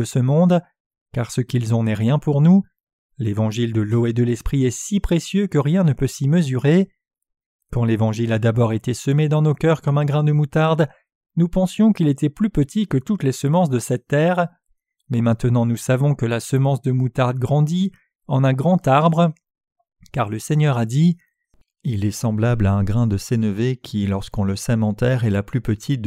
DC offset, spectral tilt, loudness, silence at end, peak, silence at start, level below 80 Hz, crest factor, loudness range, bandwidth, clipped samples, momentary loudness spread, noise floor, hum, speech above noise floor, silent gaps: under 0.1%; -7 dB/octave; -19 LUFS; 0 s; -4 dBFS; 0 s; -42 dBFS; 16 dB; 2 LU; 14.5 kHz; under 0.1%; 7 LU; -60 dBFS; none; 42 dB; 0.80-0.90 s, 1.01-1.06 s, 2.83-2.87 s, 2.93-3.09 s, 7.46-7.59 s, 11.15-11.21 s